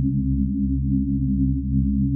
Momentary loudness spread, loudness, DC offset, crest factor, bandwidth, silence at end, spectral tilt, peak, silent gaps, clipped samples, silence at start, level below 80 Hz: 1 LU; -22 LUFS; under 0.1%; 10 dB; 0.4 kHz; 0 s; -28 dB/octave; -10 dBFS; none; under 0.1%; 0 s; -26 dBFS